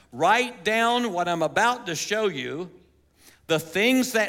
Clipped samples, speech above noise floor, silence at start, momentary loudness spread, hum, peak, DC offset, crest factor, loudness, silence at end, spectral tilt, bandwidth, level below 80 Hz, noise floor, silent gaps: under 0.1%; 33 dB; 0.15 s; 10 LU; none; -6 dBFS; under 0.1%; 18 dB; -23 LUFS; 0 s; -3.5 dB/octave; 17 kHz; -66 dBFS; -57 dBFS; none